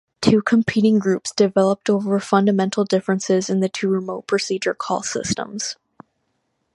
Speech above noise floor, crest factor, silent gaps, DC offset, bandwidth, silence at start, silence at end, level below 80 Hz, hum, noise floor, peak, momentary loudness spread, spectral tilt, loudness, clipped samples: 52 dB; 20 dB; none; under 0.1%; 11.5 kHz; 0.2 s; 1 s; -56 dBFS; none; -71 dBFS; 0 dBFS; 7 LU; -5 dB/octave; -20 LUFS; under 0.1%